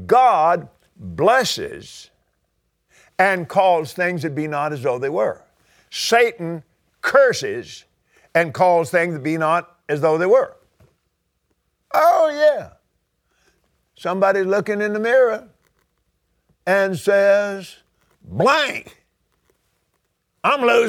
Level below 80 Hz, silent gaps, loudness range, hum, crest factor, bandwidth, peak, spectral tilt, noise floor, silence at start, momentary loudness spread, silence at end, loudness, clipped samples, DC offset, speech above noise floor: -62 dBFS; none; 2 LU; none; 20 dB; 17 kHz; 0 dBFS; -4.5 dB/octave; -71 dBFS; 0 s; 16 LU; 0 s; -18 LUFS; under 0.1%; under 0.1%; 53 dB